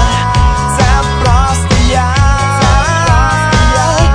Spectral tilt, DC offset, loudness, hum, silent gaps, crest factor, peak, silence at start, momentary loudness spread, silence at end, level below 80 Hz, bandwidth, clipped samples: -4.5 dB/octave; under 0.1%; -10 LUFS; none; none; 8 dB; 0 dBFS; 0 s; 1 LU; 0 s; -14 dBFS; 10.5 kHz; 0.2%